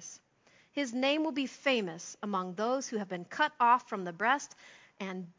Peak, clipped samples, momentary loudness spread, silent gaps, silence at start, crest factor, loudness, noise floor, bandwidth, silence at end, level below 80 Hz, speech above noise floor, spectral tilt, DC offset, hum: -14 dBFS; under 0.1%; 14 LU; none; 0 s; 20 dB; -32 LUFS; -66 dBFS; 7.6 kHz; 0.1 s; -86 dBFS; 34 dB; -3.5 dB/octave; under 0.1%; none